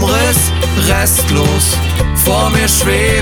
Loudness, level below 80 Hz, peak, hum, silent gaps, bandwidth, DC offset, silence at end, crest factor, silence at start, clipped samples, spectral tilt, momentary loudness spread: -11 LUFS; -18 dBFS; 0 dBFS; none; none; over 20 kHz; under 0.1%; 0 s; 10 dB; 0 s; under 0.1%; -3.5 dB/octave; 3 LU